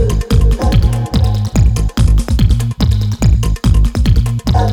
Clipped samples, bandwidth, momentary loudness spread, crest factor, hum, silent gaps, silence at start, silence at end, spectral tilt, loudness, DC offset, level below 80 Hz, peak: under 0.1%; 14 kHz; 2 LU; 10 dB; none; none; 0 s; 0 s; -6.5 dB/octave; -13 LUFS; under 0.1%; -14 dBFS; 0 dBFS